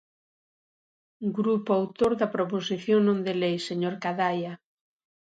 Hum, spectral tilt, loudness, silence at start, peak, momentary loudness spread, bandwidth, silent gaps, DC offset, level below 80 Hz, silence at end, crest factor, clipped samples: none; -6.5 dB/octave; -27 LUFS; 1.2 s; -10 dBFS; 9 LU; 9.4 kHz; none; under 0.1%; -66 dBFS; 0.8 s; 18 dB; under 0.1%